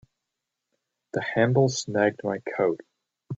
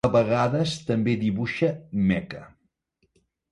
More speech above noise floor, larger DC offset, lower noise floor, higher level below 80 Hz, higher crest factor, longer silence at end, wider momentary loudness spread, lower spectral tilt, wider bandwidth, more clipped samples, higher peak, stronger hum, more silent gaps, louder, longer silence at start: first, 60 dB vs 47 dB; neither; first, -84 dBFS vs -71 dBFS; second, -68 dBFS vs -52 dBFS; about the same, 20 dB vs 18 dB; second, 0 s vs 1.05 s; first, 10 LU vs 7 LU; second, -5.5 dB/octave vs -7 dB/octave; second, 8.2 kHz vs 11 kHz; neither; about the same, -6 dBFS vs -8 dBFS; neither; neither; about the same, -25 LUFS vs -24 LUFS; first, 1.15 s vs 0.05 s